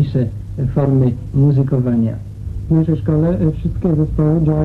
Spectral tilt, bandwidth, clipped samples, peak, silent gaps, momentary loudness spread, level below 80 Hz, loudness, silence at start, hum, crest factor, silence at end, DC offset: -11.5 dB/octave; 4.4 kHz; under 0.1%; -4 dBFS; none; 8 LU; -30 dBFS; -16 LUFS; 0 s; none; 12 dB; 0 s; under 0.1%